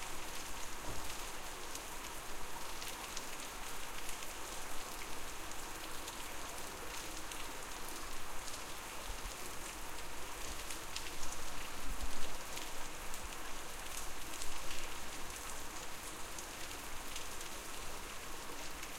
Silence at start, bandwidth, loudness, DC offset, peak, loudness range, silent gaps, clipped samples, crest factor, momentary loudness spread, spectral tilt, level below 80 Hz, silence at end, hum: 0 s; 16 kHz; -45 LUFS; under 0.1%; -20 dBFS; 1 LU; none; under 0.1%; 20 dB; 2 LU; -1.5 dB/octave; -50 dBFS; 0 s; none